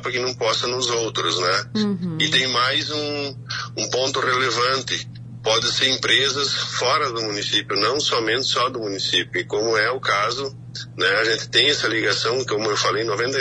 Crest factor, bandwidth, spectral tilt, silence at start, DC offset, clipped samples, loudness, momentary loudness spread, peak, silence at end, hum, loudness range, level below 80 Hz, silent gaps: 18 dB; 10.5 kHz; -2.5 dB/octave; 0 s; under 0.1%; under 0.1%; -20 LUFS; 8 LU; -4 dBFS; 0 s; none; 2 LU; -58 dBFS; none